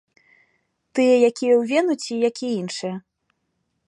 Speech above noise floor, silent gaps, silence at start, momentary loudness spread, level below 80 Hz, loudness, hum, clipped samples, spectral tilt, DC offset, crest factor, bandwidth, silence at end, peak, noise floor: 54 dB; none; 0.95 s; 13 LU; -76 dBFS; -21 LUFS; none; under 0.1%; -4.5 dB/octave; under 0.1%; 18 dB; 11 kHz; 0.9 s; -6 dBFS; -73 dBFS